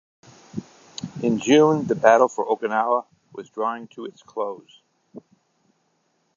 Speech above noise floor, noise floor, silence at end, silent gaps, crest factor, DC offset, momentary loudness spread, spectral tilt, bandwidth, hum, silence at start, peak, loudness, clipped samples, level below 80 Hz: 48 dB; -69 dBFS; 1.15 s; none; 22 dB; under 0.1%; 21 LU; -5.5 dB/octave; 7.6 kHz; none; 0.55 s; -2 dBFS; -21 LUFS; under 0.1%; -68 dBFS